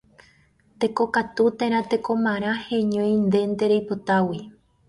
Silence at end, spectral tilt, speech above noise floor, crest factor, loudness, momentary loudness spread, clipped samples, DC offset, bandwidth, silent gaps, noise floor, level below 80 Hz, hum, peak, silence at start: 0.4 s; -7 dB/octave; 37 dB; 16 dB; -23 LUFS; 5 LU; under 0.1%; under 0.1%; 11.5 kHz; none; -59 dBFS; -60 dBFS; none; -8 dBFS; 0.8 s